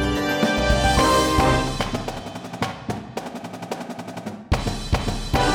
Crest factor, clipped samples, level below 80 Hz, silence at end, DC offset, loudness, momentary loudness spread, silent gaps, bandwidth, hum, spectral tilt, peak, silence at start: 18 dB; under 0.1%; -30 dBFS; 0 s; under 0.1%; -22 LUFS; 15 LU; none; 18.5 kHz; none; -4.5 dB/octave; -6 dBFS; 0 s